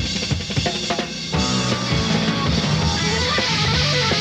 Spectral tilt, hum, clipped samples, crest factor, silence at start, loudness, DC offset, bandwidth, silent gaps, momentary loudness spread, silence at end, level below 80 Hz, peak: -4 dB/octave; none; under 0.1%; 16 dB; 0 s; -19 LUFS; under 0.1%; 12 kHz; none; 5 LU; 0 s; -34 dBFS; -4 dBFS